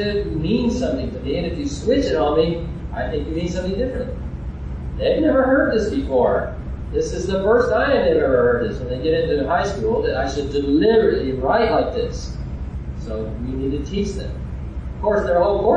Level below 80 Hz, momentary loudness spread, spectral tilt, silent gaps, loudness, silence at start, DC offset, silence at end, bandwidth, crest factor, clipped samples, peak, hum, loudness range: -30 dBFS; 13 LU; -6.5 dB/octave; none; -20 LUFS; 0 s; under 0.1%; 0 s; 9.2 kHz; 16 dB; under 0.1%; -4 dBFS; none; 5 LU